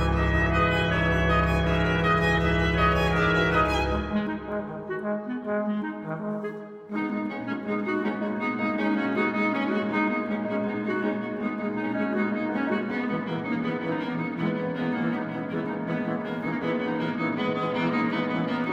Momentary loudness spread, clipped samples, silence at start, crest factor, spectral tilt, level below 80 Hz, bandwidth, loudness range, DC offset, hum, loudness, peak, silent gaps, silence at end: 9 LU; under 0.1%; 0 s; 16 dB; -7 dB/octave; -38 dBFS; 14 kHz; 7 LU; under 0.1%; none; -26 LUFS; -10 dBFS; none; 0 s